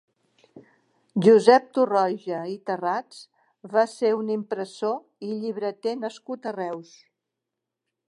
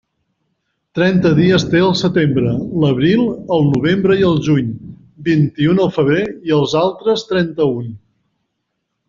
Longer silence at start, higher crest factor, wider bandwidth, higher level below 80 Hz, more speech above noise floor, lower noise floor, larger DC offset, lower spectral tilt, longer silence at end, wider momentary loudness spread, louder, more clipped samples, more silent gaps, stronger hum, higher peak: second, 0.55 s vs 0.95 s; first, 22 dB vs 14 dB; first, 11 kHz vs 7.4 kHz; second, -82 dBFS vs -46 dBFS; about the same, 61 dB vs 59 dB; first, -85 dBFS vs -73 dBFS; neither; about the same, -6 dB/octave vs -6 dB/octave; first, 1.25 s vs 1.1 s; first, 16 LU vs 6 LU; second, -24 LUFS vs -15 LUFS; neither; neither; neither; about the same, -2 dBFS vs -2 dBFS